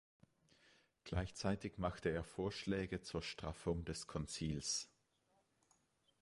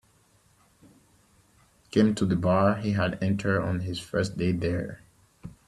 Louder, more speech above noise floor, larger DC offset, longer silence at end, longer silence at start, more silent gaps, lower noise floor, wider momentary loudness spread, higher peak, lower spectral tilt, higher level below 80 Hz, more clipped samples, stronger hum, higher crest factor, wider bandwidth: second, -43 LUFS vs -26 LUFS; about the same, 37 dB vs 38 dB; neither; first, 1.35 s vs 0.15 s; second, 1.05 s vs 1.95 s; neither; first, -80 dBFS vs -63 dBFS; second, 5 LU vs 13 LU; second, -26 dBFS vs -8 dBFS; second, -4.5 dB/octave vs -7 dB/octave; about the same, -58 dBFS vs -56 dBFS; neither; neither; about the same, 20 dB vs 20 dB; about the same, 11.5 kHz vs 12 kHz